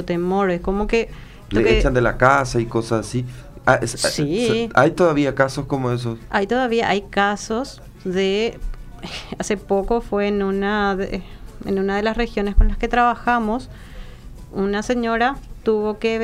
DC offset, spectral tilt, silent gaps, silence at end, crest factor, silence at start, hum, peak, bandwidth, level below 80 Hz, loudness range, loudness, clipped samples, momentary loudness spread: under 0.1%; -5.5 dB/octave; none; 0 s; 20 dB; 0 s; none; 0 dBFS; 15 kHz; -30 dBFS; 4 LU; -20 LUFS; under 0.1%; 15 LU